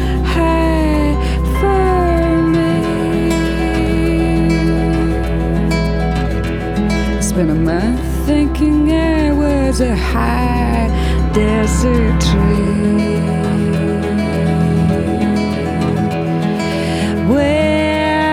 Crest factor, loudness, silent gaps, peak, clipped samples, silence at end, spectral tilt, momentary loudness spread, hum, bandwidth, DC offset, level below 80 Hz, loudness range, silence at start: 12 dB; -15 LUFS; none; -2 dBFS; under 0.1%; 0 s; -6.5 dB/octave; 4 LU; none; 15 kHz; under 0.1%; -20 dBFS; 2 LU; 0 s